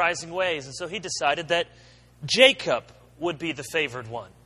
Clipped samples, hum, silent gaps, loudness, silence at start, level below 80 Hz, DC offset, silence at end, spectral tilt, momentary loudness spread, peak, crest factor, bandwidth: under 0.1%; 60 Hz at -55 dBFS; none; -24 LUFS; 0 s; -60 dBFS; under 0.1%; 0.2 s; -2.5 dB/octave; 16 LU; 0 dBFS; 26 dB; 13 kHz